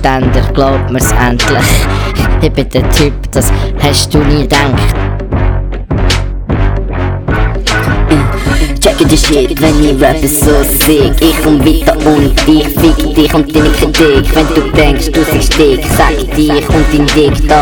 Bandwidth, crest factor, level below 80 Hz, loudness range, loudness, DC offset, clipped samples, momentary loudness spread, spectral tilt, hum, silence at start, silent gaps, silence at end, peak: over 20 kHz; 8 dB; -14 dBFS; 4 LU; -9 LUFS; 0.2%; 1%; 6 LU; -5 dB/octave; none; 0 s; none; 0 s; 0 dBFS